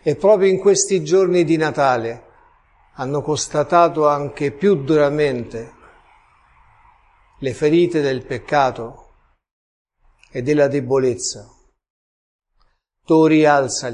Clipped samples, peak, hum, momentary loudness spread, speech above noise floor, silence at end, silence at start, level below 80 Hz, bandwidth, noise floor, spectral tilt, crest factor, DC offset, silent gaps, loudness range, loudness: under 0.1%; 0 dBFS; none; 15 LU; 45 dB; 0 s; 0.05 s; -52 dBFS; 11 kHz; -62 dBFS; -5 dB/octave; 18 dB; under 0.1%; 9.51-9.85 s, 11.90-12.39 s; 5 LU; -17 LUFS